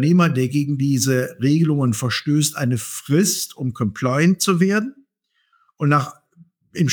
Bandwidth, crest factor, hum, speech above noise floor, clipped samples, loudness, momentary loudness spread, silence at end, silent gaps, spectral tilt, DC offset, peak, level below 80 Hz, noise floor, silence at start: over 20 kHz; 16 dB; none; 50 dB; under 0.1%; -19 LUFS; 7 LU; 0 s; none; -5 dB/octave; under 0.1%; -4 dBFS; -62 dBFS; -68 dBFS; 0 s